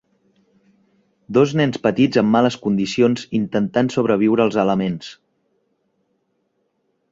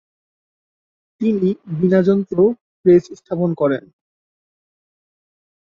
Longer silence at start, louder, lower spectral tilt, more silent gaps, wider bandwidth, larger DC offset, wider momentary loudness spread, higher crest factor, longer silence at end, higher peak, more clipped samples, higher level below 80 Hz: about the same, 1.3 s vs 1.2 s; about the same, -18 LUFS vs -18 LUFS; second, -6.5 dB/octave vs -9.5 dB/octave; second, none vs 2.61-2.84 s; first, 7.8 kHz vs 7 kHz; neither; about the same, 6 LU vs 8 LU; about the same, 18 dB vs 18 dB; first, 2 s vs 1.8 s; about the same, -2 dBFS vs -2 dBFS; neither; about the same, -56 dBFS vs -60 dBFS